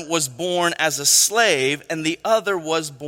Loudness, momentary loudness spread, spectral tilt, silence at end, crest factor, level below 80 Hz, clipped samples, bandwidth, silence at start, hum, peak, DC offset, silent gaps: -18 LUFS; 9 LU; -1.5 dB/octave; 0 s; 18 dB; -66 dBFS; under 0.1%; 16.5 kHz; 0 s; none; -2 dBFS; under 0.1%; none